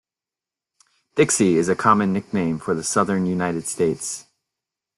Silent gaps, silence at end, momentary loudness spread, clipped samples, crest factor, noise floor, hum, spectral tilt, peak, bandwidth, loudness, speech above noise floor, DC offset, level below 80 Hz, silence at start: none; 0.75 s; 10 LU; under 0.1%; 20 dB; -90 dBFS; none; -5 dB/octave; -2 dBFS; 12.5 kHz; -21 LUFS; 69 dB; under 0.1%; -58 dBFS; 1.15 s